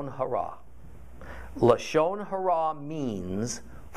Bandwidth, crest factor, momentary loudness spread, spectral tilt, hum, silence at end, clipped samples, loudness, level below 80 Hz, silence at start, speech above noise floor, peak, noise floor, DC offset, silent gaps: 14.5 kHz; 22 dB; 20 LU; -5.5 dB/octave; none; 0 s; under 0.1%; -28 LUFS; -50 dBFS; 0 s; 21 dB; -6 dBFS; -48 dBFS; 0.7%; none